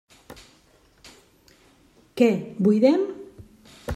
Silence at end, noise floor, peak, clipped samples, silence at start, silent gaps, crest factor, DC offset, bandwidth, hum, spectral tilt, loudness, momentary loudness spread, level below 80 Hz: 0 s; -58 dBFS; -4 dBFS; under 0.1%; 0.3 s; none; 20 dB; under 0.1%; 14 kHz; none; -7.5 dB/octave; -21 LUFS; 23 LU; -62 dBFS